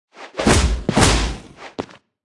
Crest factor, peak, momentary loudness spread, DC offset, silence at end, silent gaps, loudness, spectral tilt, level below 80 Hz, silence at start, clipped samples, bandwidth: 18 dB; 0 dBFS; 19 LU; under 0.1%; 0.4 s; none; -17 LUFS; -4 dB/octave; -26 dBFS; 0.2 s; under 0.1%; 12 kHz